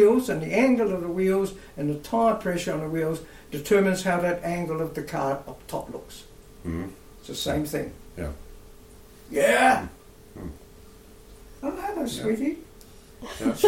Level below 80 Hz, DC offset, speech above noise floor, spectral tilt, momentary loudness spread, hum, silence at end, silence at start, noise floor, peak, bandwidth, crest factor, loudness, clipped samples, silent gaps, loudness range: -48 dBFS; under 0.1%; 23 dB; -5.5 dB/octave; 19 LU; none; 0 s; 0 s; -48 dBFS; -8 dBFS; 16.5 kHz; 18 dB; -26 LUFS; under 0.1%; none; 8 LU